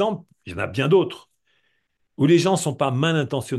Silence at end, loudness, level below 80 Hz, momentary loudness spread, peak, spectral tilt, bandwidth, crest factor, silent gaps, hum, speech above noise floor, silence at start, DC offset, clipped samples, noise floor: 0 s; -21 LUFS; -60 dBFS; 15 LU; -6 dBFS; -6 dB/octave; 12.5 kHz; 16 dB; none; none; 51 dB; 0 s; under 0.1%; under 0.1%; -72 dBFS